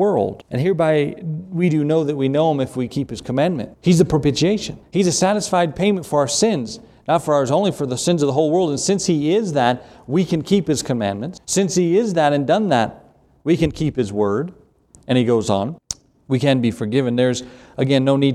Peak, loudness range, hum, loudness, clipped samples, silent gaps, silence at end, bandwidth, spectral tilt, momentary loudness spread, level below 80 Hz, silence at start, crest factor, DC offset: -2 dBFS; 2 LU; none; -19 LUFS; under 0.1%; none; 0 s; 14 kHz; -5.5 dB/octave; 8 LU; -48 dBFS; 0 s; 16 dB; under 0.1%